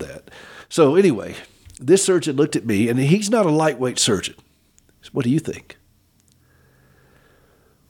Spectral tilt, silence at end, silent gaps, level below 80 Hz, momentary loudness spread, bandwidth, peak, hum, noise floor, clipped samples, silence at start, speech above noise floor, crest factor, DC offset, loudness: -5 dB/octave; 2.3 s; none; -58 dBFS; 20 LU; 17.5 kHz; -4 dBFS; none; -58 dBFS; under 0.1%; 0 s; 40 dB; 18 dB; under 0.1%; -19 LUFS